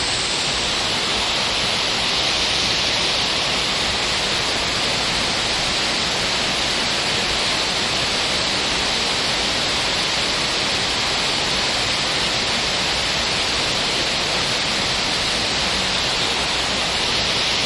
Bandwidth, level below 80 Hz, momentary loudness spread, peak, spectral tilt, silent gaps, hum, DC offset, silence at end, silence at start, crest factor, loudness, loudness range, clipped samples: 11.5 kHz; -40 dBFS; 1 LU; -6 dBFS; -1.5 dB/octave; none; none; under 0.1%; 0 s; 0 s; 14 dB; -18 LUFS; 1 LU; under 0.1%